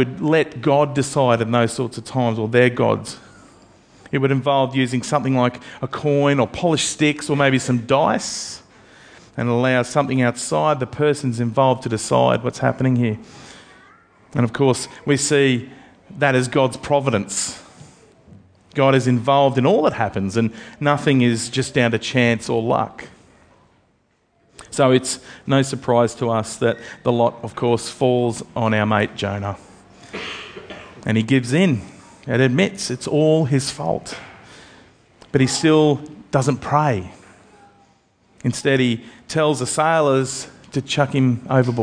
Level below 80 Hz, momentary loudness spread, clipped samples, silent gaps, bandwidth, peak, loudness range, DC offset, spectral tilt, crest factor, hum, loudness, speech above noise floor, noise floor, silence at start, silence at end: -54 dBFS; 12 LU; under 0.1%; none; 10.5 kHz; 0 dBFS; 3 LU; under 0.1%; -5.5 dB/octave; 18 dB; none; -19 LUFS; 44 dB; -63 dBFS; 0 s; 0 s